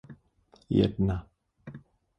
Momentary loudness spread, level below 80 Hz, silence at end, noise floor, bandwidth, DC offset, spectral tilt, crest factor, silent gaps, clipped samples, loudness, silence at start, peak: 24 LU; -46 dBFS; 0.4 s; -63 dBFS; 6 kHz; under 0.1%; -9.5 dB/octave; 20 dB; none; under 0.1%; -28 LUFS; 0.1 s; -12 dBFS